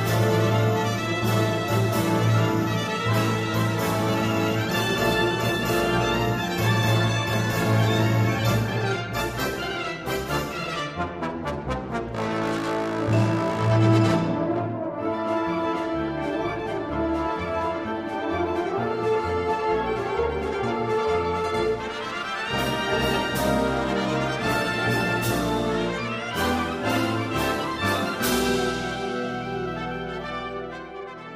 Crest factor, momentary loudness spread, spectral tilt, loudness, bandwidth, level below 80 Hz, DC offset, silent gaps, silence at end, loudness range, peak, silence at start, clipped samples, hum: 16 dB; 8 LU; -5.5 dB/octave; -24 LUFS; 15.5 kHz; -44 dBFS; under 0.1%; none; 0 s; 4 LU; -8 dBFS; 0 s; under 0.1%; none